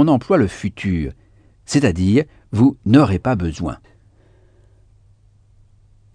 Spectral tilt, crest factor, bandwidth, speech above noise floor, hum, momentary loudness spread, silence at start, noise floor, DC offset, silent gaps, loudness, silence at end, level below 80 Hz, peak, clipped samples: -7 dB/octave; 18 dB; 10 kHz; 36 dB; none; 13 LU; 0 s; -52 dBFS; under 0.1%; none; -18 LUFS; 2.4 s; -40 dBFS; 0 dBFS; under 0.1%